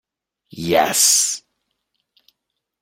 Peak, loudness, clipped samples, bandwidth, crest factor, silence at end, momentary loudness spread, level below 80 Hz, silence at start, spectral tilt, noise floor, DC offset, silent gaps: -2 dBFS; -15 LUFS; under 0.1%; 16 kHz; 20 dB; 1.45 s; 17 LU; -60 dBFS; 0.55 s; -1 dB/octave; -78 dBFS; under 0.1%; none